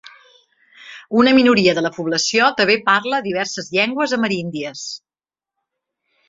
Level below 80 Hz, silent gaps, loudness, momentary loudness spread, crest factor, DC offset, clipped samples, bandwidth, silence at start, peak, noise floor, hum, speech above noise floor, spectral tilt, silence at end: -60 dBFS; none; -17 LUFS; 15 LU; 18 dB; under 0.1%; under 0.1%; 7.8 kHz; 0.8 s; 0 dBFS; under -90 dBFS; none; over 73 dB; -3.5 dB/octave; 1.3 s